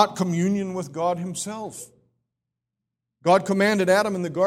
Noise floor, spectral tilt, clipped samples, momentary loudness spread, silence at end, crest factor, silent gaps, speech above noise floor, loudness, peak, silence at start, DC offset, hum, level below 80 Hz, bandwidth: -84 dBFS; -5 dB/octave; under 0.1%; 12 LU; 0 s; 22 dB; none; 62 dB; -23 LUFS; -2 dBFS; 0 s; under 0.1%; none; -64 dBFS; 15.5 kHz